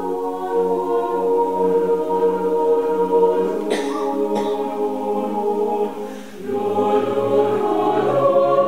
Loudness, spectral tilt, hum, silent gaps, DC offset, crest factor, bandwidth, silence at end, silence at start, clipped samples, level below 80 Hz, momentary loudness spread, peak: -19 LUFS; -6.5 dB/octave; none; none; 1%; 14 dB; 15.5 kHz; 0 s; 0 s; under 0.1%; -66 dBFS; 7 LU; -4 dBFS